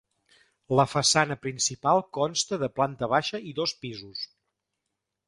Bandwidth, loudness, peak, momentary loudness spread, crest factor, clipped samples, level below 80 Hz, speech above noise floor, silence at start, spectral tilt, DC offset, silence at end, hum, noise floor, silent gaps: 11.5 kHz; -26 LUFS; -6 dBFS; 15 LU; 22 dB; under 0.1%; -62 dBFS; 57 dB; 0.7 s; -3 dB/octave; under 0.1%; 1.05 s; none; -83 dBFS; none